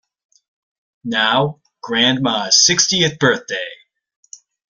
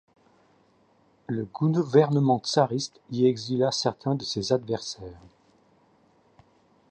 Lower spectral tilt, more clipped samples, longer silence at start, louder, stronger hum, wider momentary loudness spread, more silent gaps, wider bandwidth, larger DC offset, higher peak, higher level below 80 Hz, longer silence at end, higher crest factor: second, -2 dB/octave vs -6 dB/octave; neither; second, 1.05 s vs 1.3 s; first, -15 LUFS vs -25 LUFS; neither; first, 15 LU vs 12 LU; neither; first, 12 kHz vs 9.2 kHz; neither; first, 0 dBFS vs -6 dBFS; first, -58 dBFS vs -64 dBFS; second, 1 s vs 1.75 s; about the same, 18 dB vs 20 dB